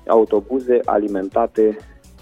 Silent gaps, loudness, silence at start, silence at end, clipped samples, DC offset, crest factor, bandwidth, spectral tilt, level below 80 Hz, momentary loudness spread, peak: none; -18 LUFS; 0.1 s; 0.4 s; under 0.1%; under 0.1%; 16 dB; 7.8 kHz; -8 dB/octave; -48 dBFS; 5 LU; -2 dBFS